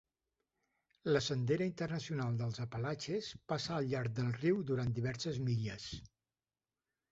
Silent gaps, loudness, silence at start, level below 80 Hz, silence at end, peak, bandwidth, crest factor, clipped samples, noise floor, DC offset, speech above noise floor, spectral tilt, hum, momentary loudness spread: none; -38 LUFS; 1.05 s; -64 dBFS; 1.05 s; -18 dBFS; 8 kHz; 20 dB; under 0.1%; under -90 dBFS; under 0.1%; over 53 dB; -6 dB/octave; none; 7 LU